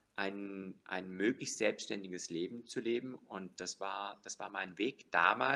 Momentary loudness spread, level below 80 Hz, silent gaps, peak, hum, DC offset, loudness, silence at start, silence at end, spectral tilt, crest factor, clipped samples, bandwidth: 12 LU; -84 dBFS; none; -14 dBFS; none; under 0.1%; -38 LUFS; 0.15 s; 0 s; -3.5 dB/octave; 24 dB; under 0.1%; 12 kHz